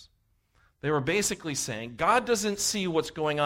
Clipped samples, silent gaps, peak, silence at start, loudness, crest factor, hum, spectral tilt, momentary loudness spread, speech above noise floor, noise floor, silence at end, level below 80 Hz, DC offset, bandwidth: under 0.1%; none; -10 dBFS; 0 s; -27 LUFS; 18 dB; none; -3 dB/octave; 7 LU; 41 dB; -69 dBFS; 0 s; -58 dBFS; under 0.1%; 16 kHz